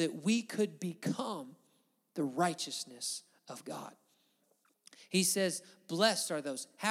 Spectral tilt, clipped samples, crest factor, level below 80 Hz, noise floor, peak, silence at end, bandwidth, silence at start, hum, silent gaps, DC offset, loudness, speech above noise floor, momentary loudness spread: -3.5 dB/octave; under 0.1%; 22 dB; under -90 dBFS; -75 dBFS; -14 dBFS; 0 s; 16.5 kHz; 0 s; none; none; under 0.1%; -35 LUFS; 39 dB; 16 LU